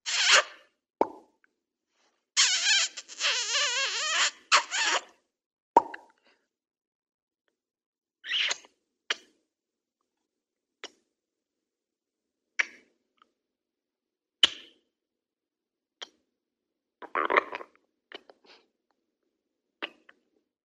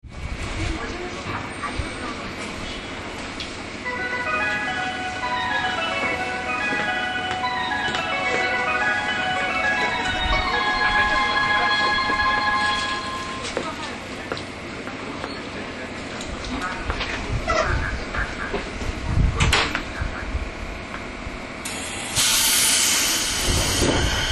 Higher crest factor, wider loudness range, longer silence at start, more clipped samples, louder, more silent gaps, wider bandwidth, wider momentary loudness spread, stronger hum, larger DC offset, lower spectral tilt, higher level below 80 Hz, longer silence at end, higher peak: first, 30 dB vs 20 dB; first, 14 LU vs 10 LU; about the same, 0.05 s vs 0.05 s; neither; second, -26 LUFS vs -23 LUFS; first, 5.46-5.50 s, 5.62-5.74 s, 6.87-7.02 s, 7.14-7.27 s, 7.86-7.93 s vs none; about the same, 13 kHz vs 13 kHz; first, 24 LU vs 13 LU; neither; neither; second, 2 dB/octave vs -2.5 dB/octave; second, -82 dBFS vs -34 dBFS; first, 0.75 s vs 0 s; about the same, -4 dBFS vs -4 dBFS